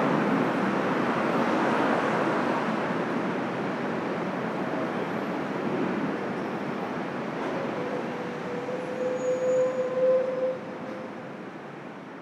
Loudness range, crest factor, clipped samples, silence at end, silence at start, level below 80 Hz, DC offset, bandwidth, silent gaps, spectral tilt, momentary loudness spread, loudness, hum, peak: 5 LU; 16 dB; under 0.1%; 0 s; 0 s; -72 dBFS; under 0.1%; 12.5 kHz; none; -6.5 dB/octave; 12 LU; -28 LUFS; none; -12 dBFS